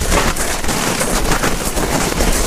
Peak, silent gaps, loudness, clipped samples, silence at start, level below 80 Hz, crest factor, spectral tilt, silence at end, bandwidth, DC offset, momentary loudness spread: 0 dBFS; none; -17 LUFS; under 0.1%; 0 s; -20 dBFS; 16 dB; -3 dB/octave; 0 s; 16 kHz; under 0.1%; 2 LU